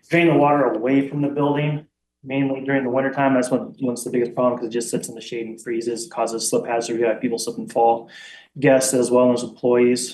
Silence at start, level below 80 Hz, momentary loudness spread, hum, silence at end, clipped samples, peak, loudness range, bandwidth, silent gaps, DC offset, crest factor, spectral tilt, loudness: 0.1 s; -70 dBFS; 11 LU; none; 0 s; under 0.1%; -4 dBFS; 4 LU; 12.5 kHz; none; under 0.1%; 16 dB; -5 dB/octave; -20 LUFS